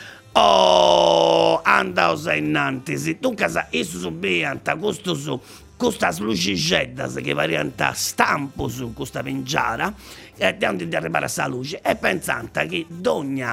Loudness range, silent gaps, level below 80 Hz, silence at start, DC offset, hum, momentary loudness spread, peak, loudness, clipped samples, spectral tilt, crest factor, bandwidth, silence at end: 6 LU; none; -50 dBFS; 0 s; under 0.1%; none; 12 LU; 0 dBFS; -21 LUFS; under 0.1%; -4 dB/octave; 20 dB; 16 kHz; 0 s